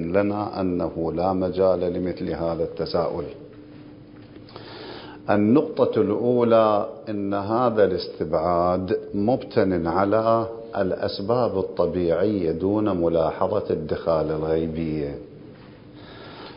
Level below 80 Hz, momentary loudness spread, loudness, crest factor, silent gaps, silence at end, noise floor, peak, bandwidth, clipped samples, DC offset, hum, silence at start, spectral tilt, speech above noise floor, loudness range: -46 dBFS; 18 LU; -23 LUFS; 18 dB; none; 0 s; -44 dBFS; -6 dBFS; 5.4 kHz; under 0.1%; under 0.1%; none; 0 s; -11.5 dB/octave; 22 dB; 5 LU